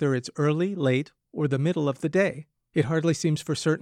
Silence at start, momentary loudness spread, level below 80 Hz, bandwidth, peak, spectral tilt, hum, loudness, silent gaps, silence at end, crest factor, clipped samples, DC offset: 0 s; 5 LU; -66 dBFS; 12.5 kHz; -10 dBFS; -6.5 dB/octave; none; -26 LUFS; none; 0 s; 14 dB; under 0.1%; under 0.1%